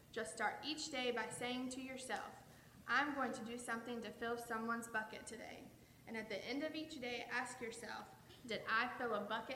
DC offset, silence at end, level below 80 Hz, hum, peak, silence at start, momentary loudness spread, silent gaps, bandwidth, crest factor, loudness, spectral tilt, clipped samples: under 0.1%; 0 s; -76 dBFS; none; -22 dBFS; 0 s; 16 LU; none; 16.5 kHz; 22 dB; -43 LUFS; -3 dB/octave; under 0.1%